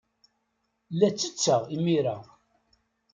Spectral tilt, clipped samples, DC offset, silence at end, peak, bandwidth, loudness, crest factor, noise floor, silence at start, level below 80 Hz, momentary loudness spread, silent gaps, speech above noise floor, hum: -5 dB/octave; under 0.1%; under 0.1%; 0.9 s; -8 dBFS; 9.4 kHz; -26 LUFS; 20 dB; -77 dBFS; 0.9 s; -72 dBFS; 9 LU; none; 51 dB; none